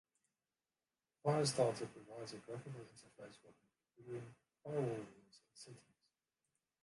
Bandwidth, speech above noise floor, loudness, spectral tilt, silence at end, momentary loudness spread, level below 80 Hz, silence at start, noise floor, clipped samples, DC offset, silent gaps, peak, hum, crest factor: 11.5 kHz; over 47 dB; -42 LUFS; -5 dB/octave; 1.05 s; 23 LU; -82 dBFS; 1.25 s; under -90 dBFS; under 0.1%; under 0.1%; none; -22 dBFS; none; 24 dB